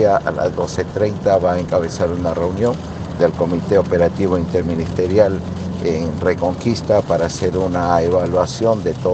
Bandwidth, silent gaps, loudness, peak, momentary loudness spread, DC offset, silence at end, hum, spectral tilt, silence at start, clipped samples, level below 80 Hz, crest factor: 8.6 kHz; none; -18 LUFS; 0 dBFS; 5 LU; under 0.1%; 0 s; none; -7 dB/octave; 0 s; under 0.1%; -42 dBFS; 16 dB